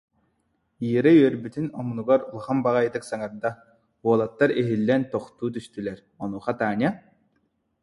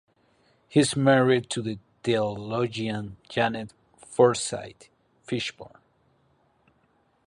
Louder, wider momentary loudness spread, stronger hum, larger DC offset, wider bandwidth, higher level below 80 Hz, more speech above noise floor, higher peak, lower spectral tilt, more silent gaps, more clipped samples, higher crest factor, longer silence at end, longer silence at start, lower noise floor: about the same, -24 LUFS vs -26 LUFS; about the same, 14 LU vs 14 LU; neither; neither; about the same, 11.5 kHz vs 11.5 kHz; about the same, -64 dBFS vs -62 dBFS; first, 48 dB vs 42 dB; about the same, -6 dBFS vs -6 dBFS; first, -7.5 dB/octave vs -5 dB/octave; neither; neither; about the same, 18 dB vs 20 dB; second, 0.85 s vs 1.6 s; about the same, 0.8 s vs 0.7 s; first, -72 dBFS vs -67 dBFS